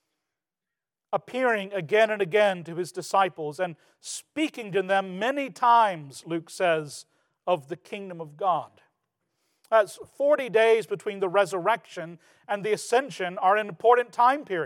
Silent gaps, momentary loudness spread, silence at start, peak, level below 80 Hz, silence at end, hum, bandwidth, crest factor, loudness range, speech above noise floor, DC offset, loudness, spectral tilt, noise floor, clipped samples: none; 16 LU; 1.1 s; -8 dBFS; -88 dBFS; 0 s; none; 17.5 kHz; 20 dB; 5 LU; 64 dB; under 0.1%; -25 LUFS; -4 dB/octave; -89 dBFS; under 0.1%